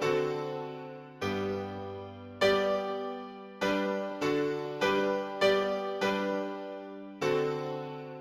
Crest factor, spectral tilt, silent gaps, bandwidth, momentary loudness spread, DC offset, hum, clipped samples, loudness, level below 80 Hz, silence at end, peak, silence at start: 18 dB; -5 dB/octave; none; 15.5 kHz; 15 LU; under 0.1%; none; under 0.1%; -32 LUFS; -66 dBFS; 0 s; -14 dBFS; 0 s